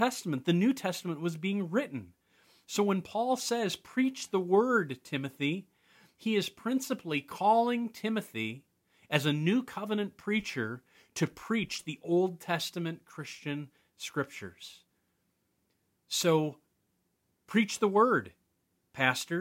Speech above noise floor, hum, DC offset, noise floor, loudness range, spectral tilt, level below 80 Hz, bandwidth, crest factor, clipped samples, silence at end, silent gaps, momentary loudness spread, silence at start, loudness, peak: 46 dB; none; under 0.1%; -77 dBFS; 5 LU; -5 dB/octave; -74 dBFS; 16.5 kHz; 24 dB; under 0.1%; 0 s; none; 13 LU; 0 s; -31 LUFS; -8 dBFS